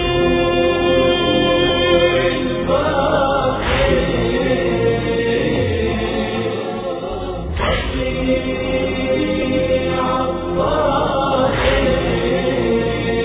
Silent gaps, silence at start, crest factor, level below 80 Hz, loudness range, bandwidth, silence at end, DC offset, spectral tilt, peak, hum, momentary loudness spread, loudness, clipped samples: none; 0 s; 14 dB; -30 dBFS; 5 LU; 4 kHz; 0 s; under 0.1%; -10 dB/octave; -2 dBFS; none; 6 LU; -17 LUFS; under 0.1%